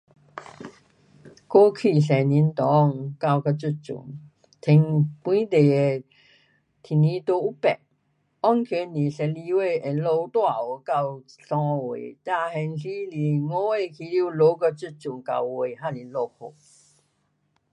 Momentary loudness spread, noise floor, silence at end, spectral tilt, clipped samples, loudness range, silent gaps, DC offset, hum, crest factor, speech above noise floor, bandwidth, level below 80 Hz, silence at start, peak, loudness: 15 LU; -70 dBFS; 1.25 s; -8.5 dB/octave; under 0.1%; 5 LU; none; under 0.1%; none; 20 dB; 48 dB; 9 kHz; -72 dBFS; 0.35 s; -4 dBFS; -23 LUFS